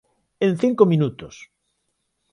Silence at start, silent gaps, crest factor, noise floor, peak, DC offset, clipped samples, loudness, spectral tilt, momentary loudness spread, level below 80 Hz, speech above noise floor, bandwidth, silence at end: 0.4 s; none; 20 dB; -73 dBFS; -2 dBFS; under 0.1%; under 0.1%; -19 LUFS; -8 dB/octave; 21 LU; -60 dBFS; 54 dB; 11 kHz; 1.05 s